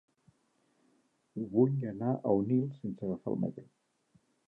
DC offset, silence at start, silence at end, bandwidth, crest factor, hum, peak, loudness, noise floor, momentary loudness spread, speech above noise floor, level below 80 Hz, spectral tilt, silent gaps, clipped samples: under 0.1%; 1.35 s; 0.85 s; 3.8 kHz; 20 dB; none; -14 dBFS; -33 LUFS; -74 dBFS; 12 LU; 42 dB; -70 dBFS; -12 dB/octave; none; under 0.1%